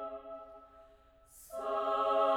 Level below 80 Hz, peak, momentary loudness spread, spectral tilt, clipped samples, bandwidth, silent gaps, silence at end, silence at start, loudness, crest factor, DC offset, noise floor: -68 dBFS; -18 dBFS; 24 LU; -3 dB/octave; under 0.1%; 17 kHz; none; 0 s; 0 s; -35 LUFS; 18 dB; under 0.1%; -62 dBFS